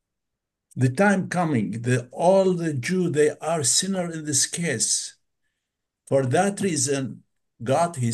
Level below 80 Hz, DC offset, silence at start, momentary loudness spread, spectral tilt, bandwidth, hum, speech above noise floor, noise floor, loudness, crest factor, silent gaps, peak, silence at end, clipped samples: -68 dBFS; under 0.1%; 0.75 s; 7 LU; -4 dB/octave; 12.5 kHz; none; 60 dB; -83 dBFS; -22 LUFS; 16 dB; none; -6 dBFS; 0 s; under 0.1%